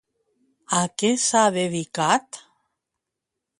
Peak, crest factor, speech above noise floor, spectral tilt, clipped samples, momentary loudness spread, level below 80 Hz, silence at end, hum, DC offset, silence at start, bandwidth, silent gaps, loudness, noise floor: -4 dBFS; 20 dB; 62 dB; -3 dB/octave; under 0.1%; 9 LU; -68 dBFS; 1.2 s; none; under 0.1%; 0.7 s; 11.5 kHz; none; -21 LUFS; -84 dBFS